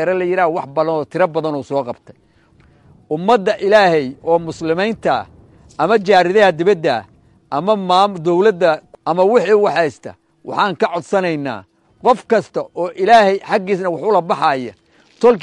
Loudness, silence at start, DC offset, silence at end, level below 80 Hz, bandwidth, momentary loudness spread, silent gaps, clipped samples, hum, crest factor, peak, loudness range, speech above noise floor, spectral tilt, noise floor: -16 LUFS; 0 s; under 0.1%; 0 s; -58 dBFS; 11 kHz; 12 LU; none; under 0.1%; none; 16 dB; 0 dBFS; 4 LU; 36 dB; -6 dB/octave; -51 dBFS